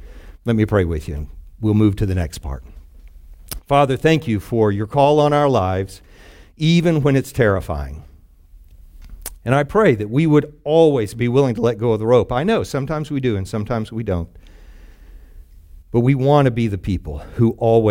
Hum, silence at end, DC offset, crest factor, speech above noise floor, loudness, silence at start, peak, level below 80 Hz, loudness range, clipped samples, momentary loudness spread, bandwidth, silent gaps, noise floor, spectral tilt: none; 0 s; under 0.1%; 16 dB; 28 dB; -18 LUFS; 0 s; -2 dBFS; -38 dBFS; 5 LU; under 0.1%; 15 LU; 16.5 kHz; none; -45 dBFS; -7.5 dB/octave